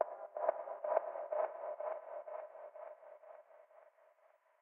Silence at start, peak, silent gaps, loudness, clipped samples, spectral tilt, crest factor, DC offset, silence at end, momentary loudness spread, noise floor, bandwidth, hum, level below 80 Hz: 0 s; -18 dBFS; none; -42 LUFS; under 0.1%; 6 dB/octave; 26 dB; under 0.1%; 0.7 s; 20 LU; -71 dBFS; 3.2 kHz; none; under -90 dBFS